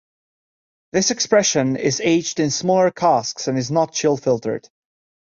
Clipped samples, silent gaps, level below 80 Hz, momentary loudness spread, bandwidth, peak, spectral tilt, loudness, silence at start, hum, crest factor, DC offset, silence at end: under 0.1%; none; -60 dBFS; 7 LU; 7.8 kHz; -2 dBFS; -4 dB/octave; -19 LUFS; 0.95 s; none; 18 dB; under 0.1%; 0.65 s